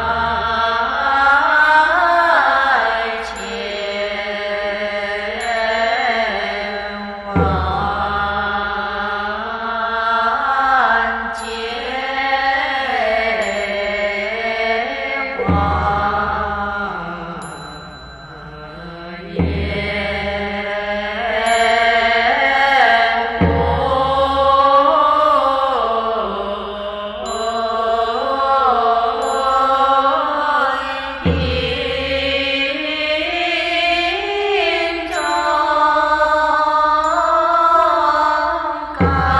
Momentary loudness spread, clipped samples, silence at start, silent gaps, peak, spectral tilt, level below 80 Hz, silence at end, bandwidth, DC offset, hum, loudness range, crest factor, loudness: 11 LU; under 0.1%; 0 s; none; -2 dBFS; -5 dB/octave; -36 dBFS; 0 s; 12 kHz; under 0.1%; none; 6 LU; 16 dB; -16 LUFS